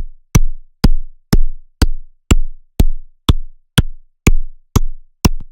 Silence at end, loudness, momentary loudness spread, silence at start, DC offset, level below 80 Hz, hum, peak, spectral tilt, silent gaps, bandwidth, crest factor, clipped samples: 0.05 s; -19 LUFS; 11 LU; 0 s; under 0.1%; -16 dBFS; none; 0 dBFS; -5 dB/octave; none; 17 kHz; 14 dB; under 0.1%